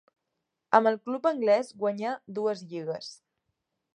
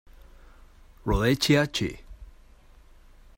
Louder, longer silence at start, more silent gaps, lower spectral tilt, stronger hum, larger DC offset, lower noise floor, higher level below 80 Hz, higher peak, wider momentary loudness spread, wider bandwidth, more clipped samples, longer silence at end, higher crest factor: second, -28 LUFS vs -25 LUFS; first, 0.7 s vs 0.2 s; neither; about the same, -5.5 dB/octave vs -5 dB/octave; neither; neither; first, -83 dBFS vs -53 dBFS; second, -84 dBFS vs -40 dBFS; first, -4 dBFS vs -8 dBFS; second, 12 LU vs 15 LU; second, 10.5 kHz vs 16.5 kHz; neither; second, 0.8 s vs 1.15 s; about the same, 24 dB vs 20 dB